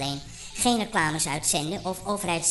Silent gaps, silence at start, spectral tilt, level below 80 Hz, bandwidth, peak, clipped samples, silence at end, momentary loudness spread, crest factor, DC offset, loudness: none; 0 s; -2.5 dB/octave; -50 dBFS; 12 kHz; -10 dBFS; under 0.1%; 0 s; 8 LU; 18 dB; under 0.1%; -26 LUFS